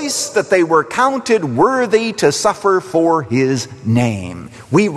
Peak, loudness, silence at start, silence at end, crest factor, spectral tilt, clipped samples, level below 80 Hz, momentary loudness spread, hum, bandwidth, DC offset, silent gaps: 0 dBFS; -15 LUFS; 0 s; 0 s; 14 dB; -5 dB/octave; under 0.1%; -52 dBFS; 6 LU; none; 13 kHz; under 0.1%; none